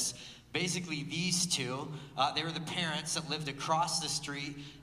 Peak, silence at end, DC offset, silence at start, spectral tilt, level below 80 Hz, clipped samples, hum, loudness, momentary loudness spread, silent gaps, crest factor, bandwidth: -14 dBFS; 0 s; under 0.1%; 0 s; -2.5 dB/octave; -64 dBFS; under 0.1%; none; -34 LUFS; 9 LU; none; 20 dB; 15.5 kHz